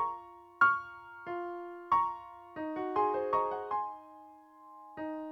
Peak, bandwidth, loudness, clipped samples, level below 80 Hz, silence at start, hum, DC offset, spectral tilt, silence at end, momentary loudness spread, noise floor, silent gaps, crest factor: -12 dBFS; 7.6 kHz; -33 LUFS; under 0.1%; -70 dBFS; 0 s; none; under 0.1%; -6.5 dB/octave; 0 s; 21 LU; -55 dBFS; none; 22 dB